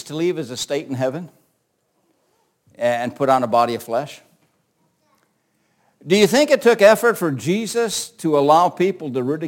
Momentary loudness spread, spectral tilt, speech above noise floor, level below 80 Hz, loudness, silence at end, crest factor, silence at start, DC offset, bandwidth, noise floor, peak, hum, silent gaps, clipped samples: 12 LU; -4.5 dB/octave; 50 dB; -66 dBFS; -18 LUFS; 0 s; 20 dB; 0.05 s; under 0.1%; 17 kHz; -68 dBFS; 0 dBFS; none; none; under 0.1%